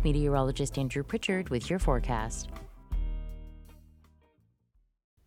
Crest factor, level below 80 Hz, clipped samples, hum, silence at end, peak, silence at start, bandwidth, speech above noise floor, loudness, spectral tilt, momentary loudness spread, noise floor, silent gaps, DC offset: 20 dB; -36 dBFS; under 0.1%; none; 1.45 s; -12 dBFS; 0 s; 14 kHz; 41 dB; -32 LUFS; -5.5 dB/octave; 17 LU; -70 dBFS; none; under 0.1%